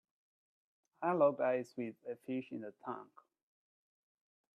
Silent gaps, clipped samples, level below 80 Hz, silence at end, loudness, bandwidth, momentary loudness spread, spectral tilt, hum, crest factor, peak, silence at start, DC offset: none; under 0.1%; -90 dBFS; 1.55 s; -38 LUFS; 10 kHz; 16 LU; -8 dB/octave; none; 20 dB; -20 dBFS; 1 s; under 0.1%